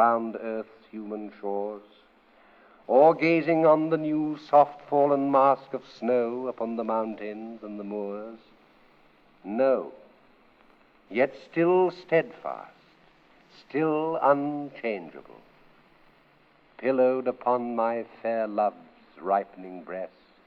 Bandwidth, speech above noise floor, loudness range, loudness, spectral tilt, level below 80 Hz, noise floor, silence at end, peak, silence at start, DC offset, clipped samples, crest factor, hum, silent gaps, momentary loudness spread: 6.4 kHz; 35 dB; 9 LU; -26 LUFS; -8.5 dB/octave; -74 dBFS; -60 dBFS; 0.4 s; -6 dBFS; 0 s; under 0.1%; under 0.1%; 20 dB; none; none; 17 LU